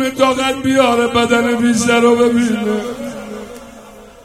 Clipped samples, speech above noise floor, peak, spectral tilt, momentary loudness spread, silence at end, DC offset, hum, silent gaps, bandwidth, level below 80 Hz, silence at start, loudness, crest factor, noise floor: under 0.1%; 24 dB; 0 dBFS; -4 dB/octave; 17 LU; 0.2 s; under 0.1%; none; none; 15 kHz; -48 dBFS; 0 s; -14 LUFS; 14 dB; -38 dBFS